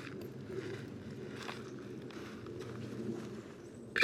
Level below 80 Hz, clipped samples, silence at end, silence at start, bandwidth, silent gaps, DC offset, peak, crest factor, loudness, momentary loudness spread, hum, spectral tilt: -68 dBFS; under 0.1%; 0 s; 0 s; 16 kHz; none; under 0.1%; -14 dBFS; 28 dB; -45 LUFS; 5 LU; none; -5 dB/octave